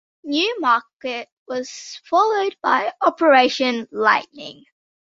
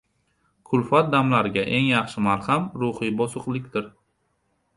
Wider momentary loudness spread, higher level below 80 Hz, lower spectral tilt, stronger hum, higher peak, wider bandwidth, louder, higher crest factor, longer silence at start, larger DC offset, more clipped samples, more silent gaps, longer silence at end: first, 17 LU vs 10 LU; second, -70 dBFS vs -58 dBFS; second, -2.5 dB/octave vs -6.5 dB/octave; neither; about the same, -2 dBFS vs -4 dBFS; second, 7.8 kHz vs 11.5 kHz; first, -19 LUFS vs -23 LUFS; about the same, 18 dB vs 20 dB; second, 0.25 s vs 0.7 s; neither; neither; first, 0.93-1.00 s, 1.32-1.46 s vs none; second, 0.55 s vs 0.85 s